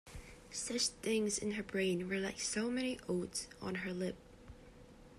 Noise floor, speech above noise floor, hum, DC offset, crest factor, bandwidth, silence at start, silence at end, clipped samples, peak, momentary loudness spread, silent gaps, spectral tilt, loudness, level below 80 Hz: -58 dBFS; 20 dB; none; under 0.1%; 18 dB; 14 kHz; 0.05 s; 0 s; under 0.1%; -22 dBFS; 19 LU; none; -3.5 dB/octave; -38 LUFS; -62 dBFS